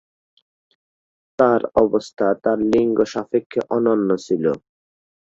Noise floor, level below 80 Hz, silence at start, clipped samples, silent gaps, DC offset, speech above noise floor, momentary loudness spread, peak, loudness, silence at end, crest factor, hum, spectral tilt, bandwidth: under -90 dBFS; -54 dBFS; 1.4 s; under 0.1%; 3.46-3.50 s; under 0.1%; over 71 dB; 6 LU; -2 dBFS; -19 LUFS; 0.8 s; 18 dB; none; -6.5 dB/octave; 7.8 kHz